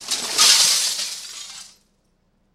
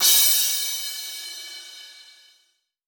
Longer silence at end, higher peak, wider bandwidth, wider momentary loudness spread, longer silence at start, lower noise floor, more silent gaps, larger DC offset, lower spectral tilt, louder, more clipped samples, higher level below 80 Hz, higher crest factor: about the same, 0.85 s vs 0.85 s; first, 0 dBFS vs -4 dBFS; second, 16 kHz vs over 20 kHz; second, 22 LU vs 25 LU; about the same, 0 s vs 0 s; second, -64 dBFS vs -68 dBFS; neither; neither; first, 3 dB/octave vs 5 dB/octave; first, -15 LUFS vs -19 LUFS; neither; first, -64 dBFS vs -76 dBFS; about the same, 22 dB vs 20 dB